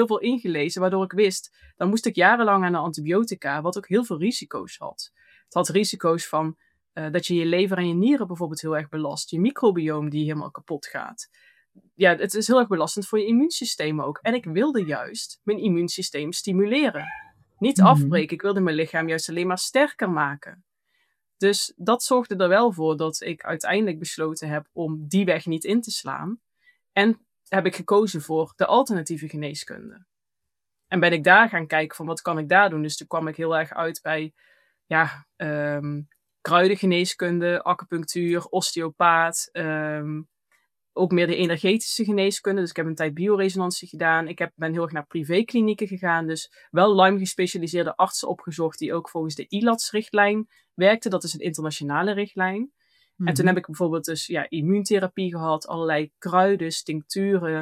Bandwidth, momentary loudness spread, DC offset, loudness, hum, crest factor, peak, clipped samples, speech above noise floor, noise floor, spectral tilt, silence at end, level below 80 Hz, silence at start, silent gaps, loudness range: 15.5 kHz; 11 LU; under 0.1%; -23 LUFS; none; 22 dB; -2 dBFS; under 0.1%; 63 dB; -86 dBFS; -5 dB/octave; 0 s; -72 dBFS; 0 s; none; 4 LU